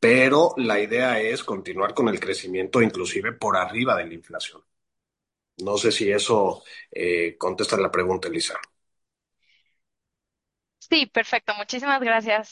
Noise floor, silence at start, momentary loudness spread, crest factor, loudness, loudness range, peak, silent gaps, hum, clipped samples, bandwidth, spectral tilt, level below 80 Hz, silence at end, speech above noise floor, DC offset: -86 dBFS; 0 s; 10 LU; 20 dB; -23 LUFS; 4 LU; -4 dBFS; none; none; under 0.1%; 11.5 kHz; -3.5 dB/octave; -60 dBFS; 0.1 s; 63 dB; under 0.1%